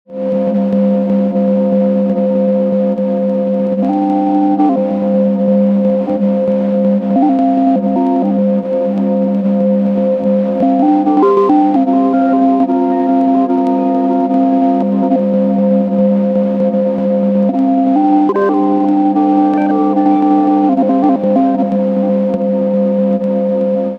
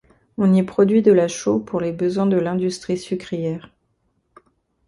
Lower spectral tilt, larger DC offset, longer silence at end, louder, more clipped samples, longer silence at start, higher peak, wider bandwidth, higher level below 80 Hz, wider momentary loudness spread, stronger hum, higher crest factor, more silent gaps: first, -10.5 dB/octave vs -7 dB/octave; neither; second, 0 s vs 1.3 s; first, -12 LUFS vs -19 LUFS; neither; second, 0.1 s vs 0.4 s; about the same, 0 dBFS vs -2 dBFS; second, 4.8 kHz vs 11.5 kHz; about the same, -56 dBFS vs -58 dBFS; second, 3 LU vs 11 LU; neither; second, 12 dB vs 18 dB; neither